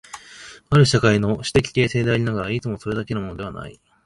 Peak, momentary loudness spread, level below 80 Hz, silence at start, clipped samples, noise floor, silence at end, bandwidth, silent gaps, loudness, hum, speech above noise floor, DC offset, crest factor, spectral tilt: -2 dBFS; 22 LU; -44 dBFS; 0.15 s; under 0.1%; -43 dBFS; 0.35 s; 11.5 kHz; none; -20 LUFS; none; 23 dB; under 0.1%; 20 dB; -6 dB/octave